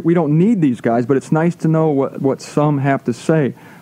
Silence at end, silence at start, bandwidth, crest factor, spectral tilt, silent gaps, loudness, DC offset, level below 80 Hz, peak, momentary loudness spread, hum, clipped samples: 0.3 s; 0 s; 11 kHz; 14 dB; -8 dB/octave; none; -16 LUFS; under 0.1%; -64 dBFS; -2 dBFS; 5 LU; none; under 0.1%